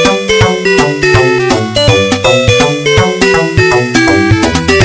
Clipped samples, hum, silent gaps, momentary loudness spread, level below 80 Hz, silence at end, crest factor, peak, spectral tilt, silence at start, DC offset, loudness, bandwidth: 1%; none; none; 2 LU; -26 dBFS; 0 s; 8 dB; 0 dBFS; -4.5 dB/octave; 0 s; under 0.1%; -8 LUFS; 8 kHz